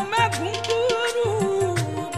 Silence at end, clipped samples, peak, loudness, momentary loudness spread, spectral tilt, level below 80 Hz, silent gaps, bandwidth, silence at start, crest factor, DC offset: 0 s; under 0.1%; -8 dBFS; -23 LUFS; 3 LU; -4.5 dB/octave; -54 dBFS; none; 15 kHz; 0 s; 14 dB; 0.3%